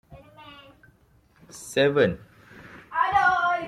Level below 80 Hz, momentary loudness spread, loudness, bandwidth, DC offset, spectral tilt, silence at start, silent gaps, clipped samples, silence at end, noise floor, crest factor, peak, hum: -58 dBFS; 25 LU; -23 LUFS; 14 kHz; under 0.1%; -4.5 dB/octave; 0.1 s; none; under 0.1%; 0 s; -60 dBFS; 18 dB; -8 dBFS; none